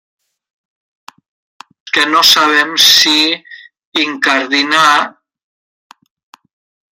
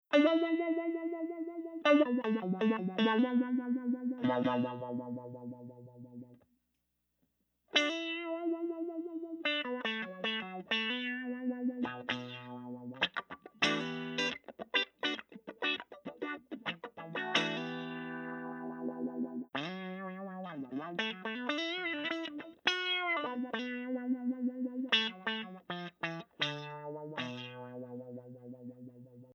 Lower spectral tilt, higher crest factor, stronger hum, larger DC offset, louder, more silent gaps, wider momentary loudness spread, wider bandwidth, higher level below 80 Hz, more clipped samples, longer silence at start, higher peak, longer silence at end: second, 0 dB/octave vs -4.5 dB/octave; second, 14 dB vs 24 dB; second, none vs 60 Hz at -75 dBFS; neither; first, -9 LUFS vs -35 LUFS; first, 3.85-3.92 s vs none; second, 10 LU vs 15 LU; first, 18 kHz vs 8.8 kHz; first, -66 dBFS vs -82 dBFS; neither; first, 1.85 s vs 0.1 s; first, 0 dBFS vs -12 dBFS; first, 1.8 s vs 0 s